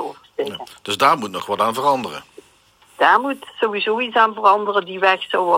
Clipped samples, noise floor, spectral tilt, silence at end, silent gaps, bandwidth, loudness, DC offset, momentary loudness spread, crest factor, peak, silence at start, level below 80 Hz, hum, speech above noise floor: under 0.1%; -54 dBFS; -3.5 dB/octave; 0 s; none; 16.5 kHz; -18 LUFS; under 0.1%; 13 LU; 18 dB; 0 dBFS; 0 s; -70 dBFS; none; 36 dB